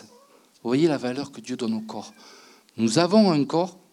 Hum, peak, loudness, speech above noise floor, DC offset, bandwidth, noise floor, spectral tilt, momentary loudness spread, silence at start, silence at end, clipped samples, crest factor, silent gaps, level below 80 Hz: none; -6 dBFS; -23 LUFS; 32 dB; under 0.1%; 12 kHz; -56 dBFS; -5.5 dB/octave; 19 LU; 0.65 s; 0.2 s; under 0.1%; 18 dB; none; -78 dBFS